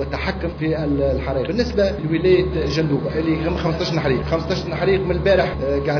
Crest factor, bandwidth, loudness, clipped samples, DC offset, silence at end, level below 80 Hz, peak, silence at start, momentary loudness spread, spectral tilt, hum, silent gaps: 14 dB; 5.4 kHz; -20 LUFS; under 0.1%; under 0.1%; 0 s; -32 dBFS; -4 dBFS; 0 s; 5 LU; -7 dB/octave; none; none